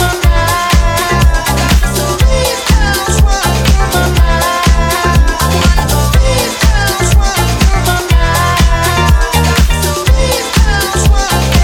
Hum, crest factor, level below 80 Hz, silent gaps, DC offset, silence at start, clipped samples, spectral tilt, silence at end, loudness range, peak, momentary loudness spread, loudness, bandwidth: none; 10 dB; -12 dBFS; none; under 0.1%; 0 s; under 0.1%; -4 dB/octave; 0 s; 0 LU; 0 dBFS; 1 LU; -11 LUFS; 18 kHz